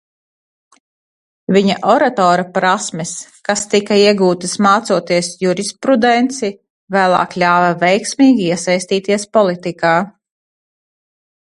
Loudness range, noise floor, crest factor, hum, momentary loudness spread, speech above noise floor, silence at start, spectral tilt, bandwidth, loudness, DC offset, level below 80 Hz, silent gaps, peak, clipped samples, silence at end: 2 LU; under -90 dBFS; 16 dB; none; 8 LU; over 76 dB; 1.5 s; -4.5 dB/octave; 11.5 kHz; -14 LUFS; under 0.1%; -60 dBFS; 6.70-6.87 s; 0 dBFS; under 0.1%; 1.45 s